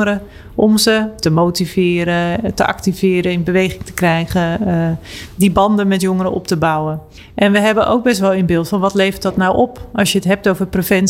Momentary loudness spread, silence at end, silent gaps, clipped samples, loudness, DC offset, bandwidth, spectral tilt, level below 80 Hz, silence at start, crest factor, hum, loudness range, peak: 6 LU; 0 s; none; under 0.1%; -15 LUFS; under 0.1%; 16.5 kHz; -5.5 dB/octave; -38 dBFS; 0 s; 12 dB; none; 2 LU; -2 dBFS